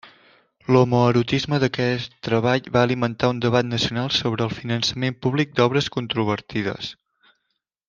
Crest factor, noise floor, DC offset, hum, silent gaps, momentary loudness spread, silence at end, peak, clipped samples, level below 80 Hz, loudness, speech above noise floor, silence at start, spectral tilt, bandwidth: 20 dB; -77 dBFS; under 0.1%; none; none; 8 LU; 0.95 s; -2 dBFS; under 0.1%; -54 dBFS; -21 LUFS; 56 dB; 0.05 s; -6 dB/octave; 7.4 kHz